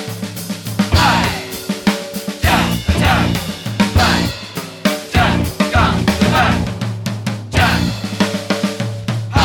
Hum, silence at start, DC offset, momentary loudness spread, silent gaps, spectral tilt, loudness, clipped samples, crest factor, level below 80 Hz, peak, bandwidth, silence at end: none; 0 s; under 0.1%; 10 LU; none; -5 dB/octave; -16 LUFS; under 0.1%; 14 dB; -28 dBFS; -2 dBFS; 19.5 kHz; 0 s